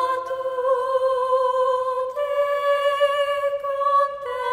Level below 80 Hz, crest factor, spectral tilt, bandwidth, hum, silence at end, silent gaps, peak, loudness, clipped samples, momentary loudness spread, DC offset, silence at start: -64 dBFS; 14 dB; -1.5 dB/octave; 16 kHz; none; 0 s; none; -8 dBFS; -22 LUFS; under 0.1%; 5 LU; under 0.1%; 0 s